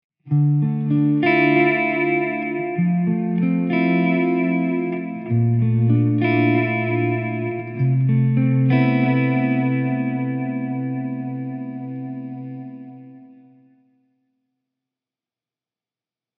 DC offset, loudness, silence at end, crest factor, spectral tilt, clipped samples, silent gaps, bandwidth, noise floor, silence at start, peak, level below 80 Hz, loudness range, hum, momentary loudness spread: under 0.1%; -20 LUFS; 3.15 s; 16 dB; -7.5 dB/octave; under 0.1%; none; 5.2 kHz; under -90 dBFS; 0.25 s; -4 dBFS; -76 dBFS; 13 LU; none; 13 LU